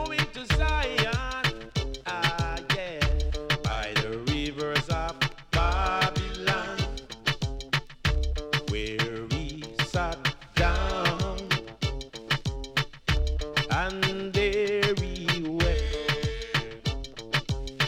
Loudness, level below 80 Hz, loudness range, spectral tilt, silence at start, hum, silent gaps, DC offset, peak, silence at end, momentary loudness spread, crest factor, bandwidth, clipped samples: -28 LUFS; -34 dBFS; 2 LU; -4.5 dB/octave; 0 s; none; none; under 0.1%; -8 dBFS; 0 s; 7 LU; 18 dB; 16.5 kHz; under 0.1%